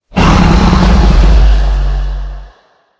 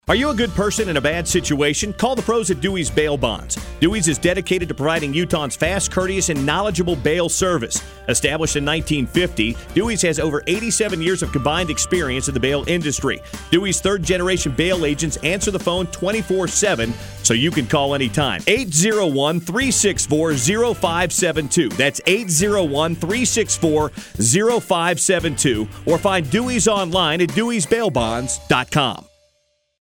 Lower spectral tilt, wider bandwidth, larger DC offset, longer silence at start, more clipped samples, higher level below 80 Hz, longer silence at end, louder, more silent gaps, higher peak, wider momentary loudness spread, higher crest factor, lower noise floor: first, -6.5 dB/octave vs -3.5 dB/octave; second, 8 kHz vs 17.5 kHz; neither; about the same, 0.15 s vs 0.05 s; first, 1% vs under 0.1%; first, -10 dBFS vs -36 dBFS; second, 0.5 s vs 0.8 s; first, -10 LUFS vs -18 LUFS; neither; about the same, 0 dBFS vs -2 dBFS; first, 13 LU vs 4 LU; second, 8 dB vs 16 dB; second, -47 dBFS vs -66 dBFS